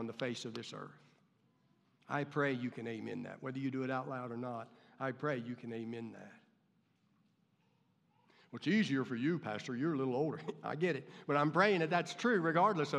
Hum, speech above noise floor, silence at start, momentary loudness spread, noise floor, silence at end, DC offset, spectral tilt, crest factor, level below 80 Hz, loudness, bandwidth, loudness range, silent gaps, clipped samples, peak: none; 39 dB; 0 s; 14 LU; -75 dBFS; 0 s; under 0.1%; -6 dB/octave; 22 dB; under -90 dBFS; -37 LUFS; 11 kHz; 10 LU; none; under 0.1%; -16 dBFS